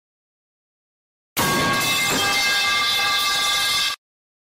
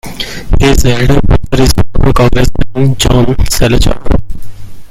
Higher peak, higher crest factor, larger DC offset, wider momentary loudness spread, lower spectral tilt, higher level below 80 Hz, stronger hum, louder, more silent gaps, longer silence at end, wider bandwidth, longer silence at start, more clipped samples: second, -10 dBFS vs 0 dBFS; first, 12 dB vs 6 dB; neither; about the same, 6 LU vs 7 LU; second, -1 dB/octave vs -5.5 dB/octave; second, -52 dBFS vs -14 dBFS; neither; second, -18 LUFS vs -10 LUFS; neither; first, 0.45 s vs 0.05 s; about the same, 16.5 kHz vs 16 kHz; first, 1.35 s vs 0.05 s; second, under 0.1% vs 2%